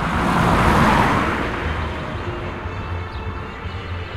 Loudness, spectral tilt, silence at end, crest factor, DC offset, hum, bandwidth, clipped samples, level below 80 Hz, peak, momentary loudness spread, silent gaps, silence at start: -20 LUFS; -6 dB/octave; 0 s; 18 dB; under 0.1%; none; 16 kHz; under 0.1%; -30 dBFS; -2 dBFS; 14 LU; none; 0 s